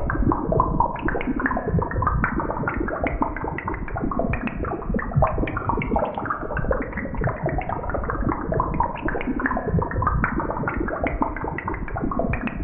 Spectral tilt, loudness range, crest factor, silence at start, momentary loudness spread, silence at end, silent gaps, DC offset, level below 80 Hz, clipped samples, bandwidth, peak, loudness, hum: -12 dB/octave; 2 LU; 18 dB; 0 s; 5 LU; 0 s; none; under 0.1%; -30 dBFS; under 0.1%; 3.6 kHz; -6 dBFS; -25 LUFS; none